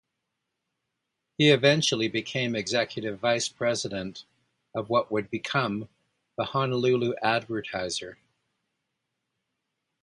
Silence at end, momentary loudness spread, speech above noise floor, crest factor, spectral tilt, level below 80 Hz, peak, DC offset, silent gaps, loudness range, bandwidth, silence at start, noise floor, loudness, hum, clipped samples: 1.9 s; 15 LU; 56 dB; 22 dB; -4.5 dB/octave; -66 dBFS; -6 dBFS; under 0.1%; none; 5 LU; 11.5 kHz; 1.4 s; -82 dBFS; -26 LUFS; none; under 0.1%